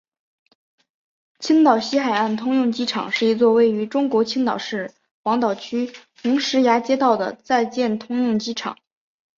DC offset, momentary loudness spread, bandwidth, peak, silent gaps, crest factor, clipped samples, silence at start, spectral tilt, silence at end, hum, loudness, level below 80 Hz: under 0.1%; 12 LU; 7.6 kHz; -4 dBFS; 5.11-5.24 s; 18 dB; under 0.1%; 1.4 s; -4.5 dB/octave; 0.65 s; none; -20 LUFS; -68 dBFS